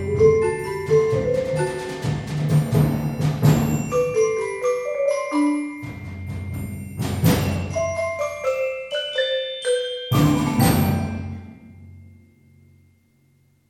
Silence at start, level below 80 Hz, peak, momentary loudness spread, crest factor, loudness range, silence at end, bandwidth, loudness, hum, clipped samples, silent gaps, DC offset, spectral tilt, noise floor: 0 s; -42 dBFS; -4 dBFS; 13 LU; 18 dB; 4 LU; 1.55 s; 17 kHz; -22 LUFS; none; under 0.1%; none; under 0.1%; -6 dB/octave; -60 dBFS